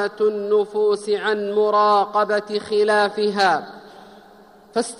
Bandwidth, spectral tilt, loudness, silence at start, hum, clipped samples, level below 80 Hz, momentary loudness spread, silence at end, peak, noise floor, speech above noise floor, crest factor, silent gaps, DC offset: 11.5 kHz; -4 dB/octave; -19 LUFS; 0 s; none; under 0.1%; -68 dBFS; 7 LU; 0 s; -6 dBFS; -48 dBFS; 28 dB; 14 dB; none; under 0.1%